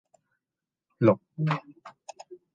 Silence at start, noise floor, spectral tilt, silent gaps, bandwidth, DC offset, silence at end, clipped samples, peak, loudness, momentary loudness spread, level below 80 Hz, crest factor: 1 s; -90 dBFS; -8 dB/octave; none; 7.6 kHz; under 0.1%; 0.2 s; under 0.1%; -8 dBFS; -27 LUFS; 23 LU; -70 dBFS; 22 dB